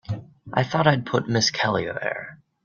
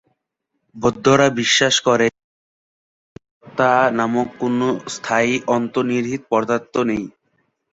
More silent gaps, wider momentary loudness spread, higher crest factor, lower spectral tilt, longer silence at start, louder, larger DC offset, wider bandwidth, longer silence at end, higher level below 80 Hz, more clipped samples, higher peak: second, none vs 2.24-3.16 s, 3.31-3.41 s; first, 14 LU vs 8 LU; about the same, 20 dB vs 18 dB; about the same, -4.5 dB/octave vs -4 dB/octave; second, 0.1 s vs 0.75 s; second, -23 LUFS vs -18 LUFS; neither; second, 7.2 kHz vs 8 kHz; second, 0.3 s vs 0.65 s; about the same, -58 dBFS vs -56 dBFS; neither; about the same, -4 dBFS vs -2 dBFS